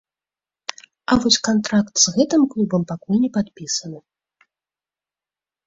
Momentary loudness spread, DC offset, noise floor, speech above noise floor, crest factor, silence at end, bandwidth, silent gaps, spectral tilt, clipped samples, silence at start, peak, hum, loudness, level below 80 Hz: 17 LU; under 0.1%; under -90 dBFS; over 71 dB; 20 dB; 1.7 s; 7.8 kHz; none; -3.5 dB/octave; under 0.1%; 1.1 s; -2 dBFS; none; -19 LUFS; -52 dBFS